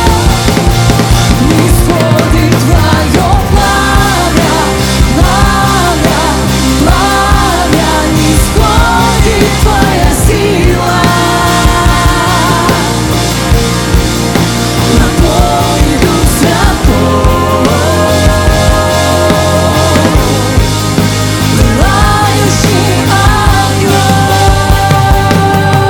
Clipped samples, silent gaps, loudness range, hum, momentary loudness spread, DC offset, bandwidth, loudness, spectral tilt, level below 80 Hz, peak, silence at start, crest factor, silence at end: 1%; none; 1 LU; none; 2 LU; under 0.1%; over 20 kHz; -8 LUFS; -5 dB/octave; -14 dBFS; 0 dBFS; 0 s; 8 dB; 0 s